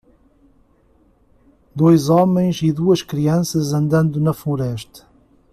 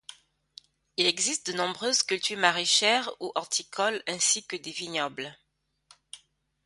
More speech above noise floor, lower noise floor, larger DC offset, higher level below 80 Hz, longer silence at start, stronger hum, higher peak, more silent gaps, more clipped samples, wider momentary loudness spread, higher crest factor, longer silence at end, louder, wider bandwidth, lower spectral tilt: about the same, 39 dB vs 37 dB; second, -56 dBFS vs -65 dBFS; neither; first, -50 dBFS vs -76 dBFS; first, 1.75 s vs 0.1 s; neither; about the same, -2 dBFS vs -4 dBFS; neither; neither; second, 11 LU vs 14 LU; second, 16 dB vs 26 dB; about the same, 0.55 s vs 0.5 s; first, -17 LUFS vs -26 LUFS; first, 14.5 kHz vs 11.5 kHz; first, -7 dB/octave vs -0.5 dB/octave